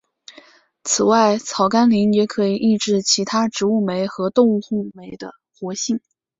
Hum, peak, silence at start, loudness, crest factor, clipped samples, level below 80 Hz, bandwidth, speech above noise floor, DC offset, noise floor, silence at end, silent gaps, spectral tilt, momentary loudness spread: none; -2 dBFS; 0.85 s; -18 LUFS; 16 dB; under 0.1%; -62 dBFS; 8 kHz; 31 dB; under 0.1%; -49 dBFS; 0.4 s; none; -4 dB/octave; 17 LU